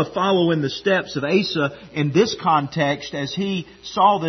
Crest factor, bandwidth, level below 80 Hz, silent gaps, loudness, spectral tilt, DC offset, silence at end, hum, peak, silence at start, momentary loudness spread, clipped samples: 16 dB; 6.4 kHz; -56 dBFS; none; -21 LUFS; -5.5 dB/octave; under 0.1%; 0 s; none; -4 dBFS; 0 s; 8 LU; under 0.1%